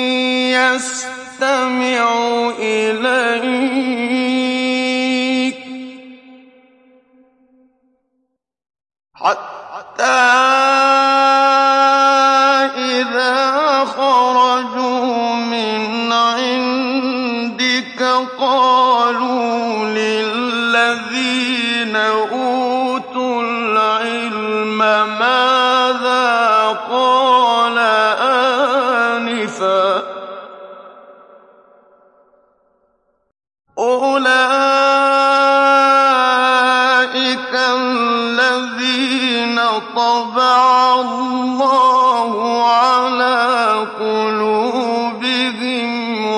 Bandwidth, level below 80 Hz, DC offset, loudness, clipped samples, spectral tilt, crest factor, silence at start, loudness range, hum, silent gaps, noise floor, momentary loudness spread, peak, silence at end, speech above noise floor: 11.5 kHz; -70 dBFS; under 0.1%; -14 LUFS; under 0.1%; -2.5 dB/octave; 14 dB; 0 s; 8 LU; none; none; -70 dBFS; 8 LU; -2 dBFS; 0 s; 54 dB